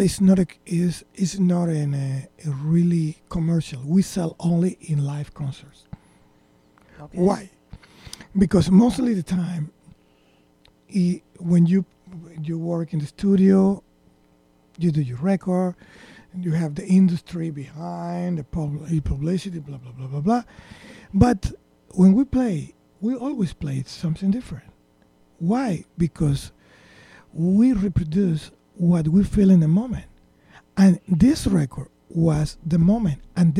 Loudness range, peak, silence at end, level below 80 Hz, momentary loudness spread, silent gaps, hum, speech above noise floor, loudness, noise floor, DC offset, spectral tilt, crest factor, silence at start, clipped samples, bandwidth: 7 LU; 0 dBFS; 0 s; -42 dBFS; 15 LU; none; none; 38 dB; -22 LUFS; -58 dBFS; under 0.1%; -8 dB/octave; 20 dB; 0 s; under 0.1%; 11.5 kHz